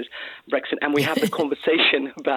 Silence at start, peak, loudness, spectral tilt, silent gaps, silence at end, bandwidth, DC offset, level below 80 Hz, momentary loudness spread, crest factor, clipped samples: 0 s; -4 dBFS; -21 LUFS; -4.5 dB/octave; none; 0 s; 18.5 kHz; under 0.1%; -68 dBFS; 10 LU; 18 dB; under 0.1%